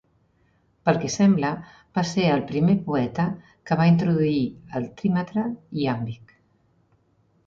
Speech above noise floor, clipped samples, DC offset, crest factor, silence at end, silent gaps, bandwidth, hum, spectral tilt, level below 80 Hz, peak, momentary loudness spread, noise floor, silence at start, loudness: 42 dB; under 0.1%; under 0.1%; 18 dB; 1.3 s; none; 7.6 kHz; none; -7 dB/octave; -56 dBFS; -6 dBFS; 11 LU; -64 dBFS; 0.85 s; -23 LUFS